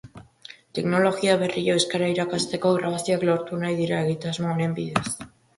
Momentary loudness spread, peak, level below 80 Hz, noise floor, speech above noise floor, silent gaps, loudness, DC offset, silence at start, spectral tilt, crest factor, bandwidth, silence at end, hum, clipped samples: 8 LU; -4 dBFS; -60 dBFS; -48 dBFS; 25 dB; none; -24 LUFS; under 0.1%; 0.05 s; -5 dB/octave; 20 dB; 11.5 kHz; 0.3 s; none; under 0.1%